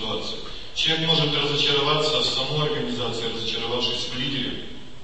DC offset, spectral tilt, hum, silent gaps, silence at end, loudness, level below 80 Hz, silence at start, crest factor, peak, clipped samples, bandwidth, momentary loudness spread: 2%; -4 dB/octave; none; none; 0 s; -23 LUFS; -48 dBFS; 0 s; 18 dB; -8 dBFS; under 0.1%; 8.8 kHz; 11 LU